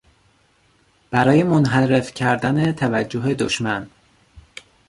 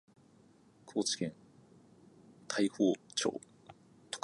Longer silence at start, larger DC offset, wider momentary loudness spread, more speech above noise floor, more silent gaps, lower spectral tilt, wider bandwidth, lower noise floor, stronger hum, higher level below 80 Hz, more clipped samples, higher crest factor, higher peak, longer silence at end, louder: first, 1.1 s vs 0.85 s; neither; second, 9 LU vs 15 LU; first, 41 dB vs 30 dB; neither; first, -6 dB/octave vs -3.5 dB/octave; about the same, 11.5 kHz vs 11.5 kHz; second, -59 dBFS vs -64 dBFS; neither; first, -52 dBFS vs -78 dBFS; neither; about the same, 20 dB vs 22 dB; first, -2 dBFS vs -16 dBFS; first, 0.5 s vs 0.05 s; first, -19 LUFS vs -35 LUFS